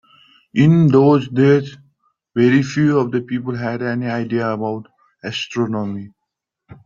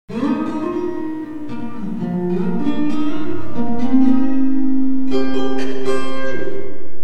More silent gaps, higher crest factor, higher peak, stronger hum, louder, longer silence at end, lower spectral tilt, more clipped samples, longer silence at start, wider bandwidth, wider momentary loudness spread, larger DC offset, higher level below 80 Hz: neither; first, 16 dB vs 10 dB; about the same, -2 dBFS vs -2 dBFS; neither; first, -17 LUFS vs -21 LUFS; about the same, 0.1 s vs 0 s; about the same, -7.5 dB/octave vs -7.5 dB/octave; neither; first, 0.55 s vs 0.05 s; second, 7.4 kHz vs 9 kHz; first, 14 LU vs 11 LU; neither; second, -56 dBFS vs -46 dBFS